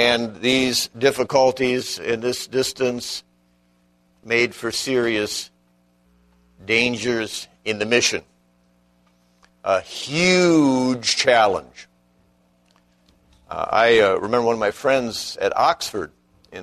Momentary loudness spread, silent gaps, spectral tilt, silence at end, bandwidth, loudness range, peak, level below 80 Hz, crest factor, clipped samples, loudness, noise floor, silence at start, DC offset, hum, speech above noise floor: 13 LU; none; -3.5 dB/octave; 0 s; 13.5 kHz; 5 LU; -2 dBFS; -56 dBFS; 20 dB; under 0.1%; -20 LUFS; -61 dBFS; 0 s; under 0.1%; 60 Hz at -50 dBFS; 41 dB